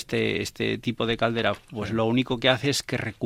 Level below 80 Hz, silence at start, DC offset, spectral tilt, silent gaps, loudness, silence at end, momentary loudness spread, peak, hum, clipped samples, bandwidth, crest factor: -52 dBFS; 0 s; under 0.1%; -4.5 dB/octave; none; -25 LUFS; 0 s; 6 LU; -4 dBFS; none; under 0.1%; 16 kHz; 22 dB